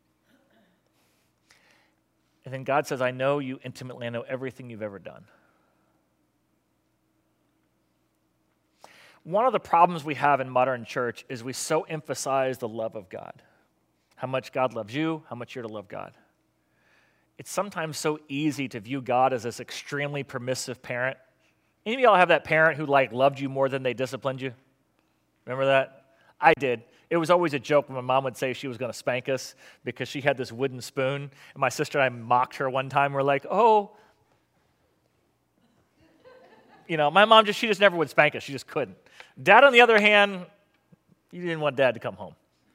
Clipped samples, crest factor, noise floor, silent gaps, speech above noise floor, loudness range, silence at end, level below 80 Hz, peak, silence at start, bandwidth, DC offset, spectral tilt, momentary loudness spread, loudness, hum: under 0.1%; 26 dB; -71 dBFS; none; 47 dB; 12 LU; 0.45 s; -76 dBFS; -2 dBFS; 2.45 s; 16 kHz; under 0.1%; -4.5 dB/octave; 18 LU; -24 LUFS; none